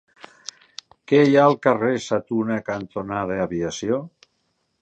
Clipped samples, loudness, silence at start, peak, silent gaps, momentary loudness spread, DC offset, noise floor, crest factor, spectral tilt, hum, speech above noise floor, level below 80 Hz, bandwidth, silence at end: under 0.1%; -21 LUFS; 1.1 s; -2 dBFS; none; 22 LU; under 0.1%; -71 dBFS; 20 dB; -6 dB/octave; none; 51 dB; -56 dBFS; 8.8 kHz; 0.75 s